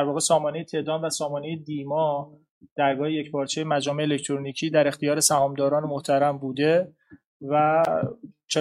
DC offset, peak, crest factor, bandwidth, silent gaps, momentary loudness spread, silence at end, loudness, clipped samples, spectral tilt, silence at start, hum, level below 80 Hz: under 0.1%; -6 dBFS; 18 dB; 13 kHz; 2.49-2.61 s, 2.71-2.76 s, 7.26-7.40 s; 11 LU; 0 s; -24 LUFS; under 0.1%; -4 dB/octave; 0 s; none; -70 dBFS